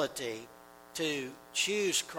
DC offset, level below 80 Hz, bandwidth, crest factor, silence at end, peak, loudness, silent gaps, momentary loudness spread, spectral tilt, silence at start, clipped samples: under 0.1%; -74 dBFS; 19 kHz; 18 dB; 0 s; -16 dBFS; -33 LUFS; none; 15 LU; -1.5 dB/octave; 0 s; under 0.1%